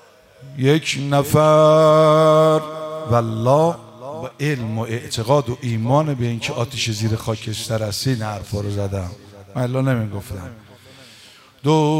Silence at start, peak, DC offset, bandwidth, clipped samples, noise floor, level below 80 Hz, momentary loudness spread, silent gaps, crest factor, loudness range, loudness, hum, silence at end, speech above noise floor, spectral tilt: 0.4 s; 0 dBFS; under 0.1%; 16 kHz; under 0.1%; -46 dBFS; -52 dBFS; 17 LU; none; 18 dB; 9 LU; -18 LUFS; none; 0 s; 29 dB; -6 dB/octave